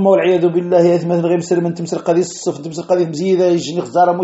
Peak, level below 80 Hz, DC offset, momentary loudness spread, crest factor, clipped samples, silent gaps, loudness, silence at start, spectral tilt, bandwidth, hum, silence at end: 0 dBFS; -62 dBFS; under 0.1%; 8 LU; 14 dB; under 0.1%; none; -15 LUFS; 0 s; -6.5 dB/octave; 8.2 kHz; none; 0 s